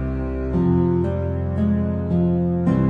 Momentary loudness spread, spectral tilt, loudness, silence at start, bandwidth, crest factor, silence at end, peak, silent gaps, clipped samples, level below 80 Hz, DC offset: 5 LU; -11.5 dB/octave; -21 LUFS; 0 s; 3.6 kHz; 12 dB; 0 s; -6 dBFS; none; under 0.1%; -32 dBFS; under 0.1%